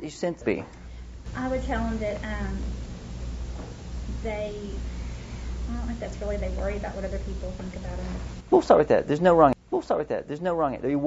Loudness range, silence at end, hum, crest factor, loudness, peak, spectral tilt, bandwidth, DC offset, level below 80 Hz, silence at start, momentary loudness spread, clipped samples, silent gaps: 11 LU; 0 s; none; 22 dB; -27 LUFS; -4 dBFS; -7 dB/octave; 8 kHz; under 0.1%; -36 dBFS; 0 s; 18 LU; under 0.1%; none